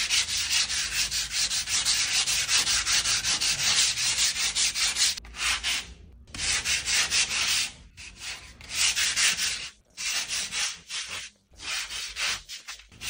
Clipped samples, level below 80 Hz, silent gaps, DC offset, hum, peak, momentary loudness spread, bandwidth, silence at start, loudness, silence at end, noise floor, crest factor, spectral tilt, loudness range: under 0.1%; -50 dBFS; none; under 0.1%; none; -8 dBFS; 15 LU; 16.5 kHz; 0 s; -24 LUFS; 0 s; -47 dBFS; 20 dB; 2 dB/octave; 5 LU